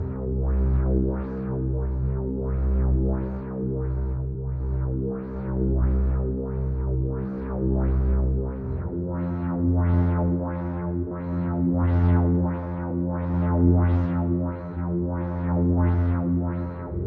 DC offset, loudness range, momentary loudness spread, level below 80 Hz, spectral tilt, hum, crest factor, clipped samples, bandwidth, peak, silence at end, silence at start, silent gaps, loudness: under 0.1%; 4 LU; 8 LU; -28 dBFS; -13 dB/octave; none; 16 dB; under 0.1%; 2.9 kHz; -8 dBFS; 0 s; 0 s; none; -25 LUFS